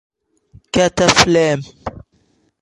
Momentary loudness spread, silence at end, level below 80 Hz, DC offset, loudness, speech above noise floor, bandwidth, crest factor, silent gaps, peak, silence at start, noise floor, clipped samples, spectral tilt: 20 LU; 0.6 s; -42 dBFS; under 0.1%; -14 LUFS; 46 dB; 16 kHz; 18 dB; none; 0 dBFS; 0.75 s; -60 dBFS; under 0.1%; -3.5 dB/octave